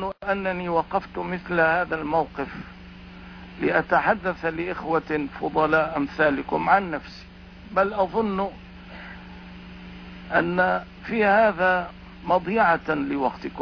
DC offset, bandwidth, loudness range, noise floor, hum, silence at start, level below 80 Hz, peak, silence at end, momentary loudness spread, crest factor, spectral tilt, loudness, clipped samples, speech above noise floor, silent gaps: under 0.1%; 5.4 kHz; 5 LU; -42 dBFS; none; 0 s; -48 dBFS; -6 dBFS; 0 s; 21 LU; 18 dB; -7.5 dB/octave; -24 LUFS; under 0.1%; 19 dB; none